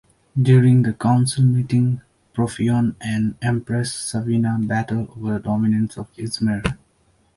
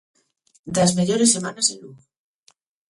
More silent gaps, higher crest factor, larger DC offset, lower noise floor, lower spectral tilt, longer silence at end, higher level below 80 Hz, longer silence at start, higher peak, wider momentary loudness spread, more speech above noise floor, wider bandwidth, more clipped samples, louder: neither; about the same, 16 dB vs 20 dB; neither; about the same, -60 dBFS vs -61 dBFS; first, -6.5 dB/octave vs -3.5 dB/octave; second, 0.6 s vs 0.95 s; first, -46 dBFS vs -60 dBFS; second, 0.35 s vs 0.65 s; about the same, -2 dBFS vs -4 dBFS; first, 11 LU vs 8 LU; about the same, 42 dB vs 41 dB; about the same, 11.5 kHz vs 11.5 kHz; neither; about the same, -20 LUFS vs -19 LUFS